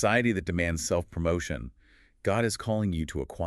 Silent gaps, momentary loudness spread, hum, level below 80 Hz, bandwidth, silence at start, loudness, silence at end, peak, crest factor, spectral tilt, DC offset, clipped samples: none; 9 LU; none; -44 dBFS; 13.5 kHz; 0 s; -29 LUFS; 0 s; -10 dBFS; 18 dB; -5 dB/octave; under 0.1%; under 0.1%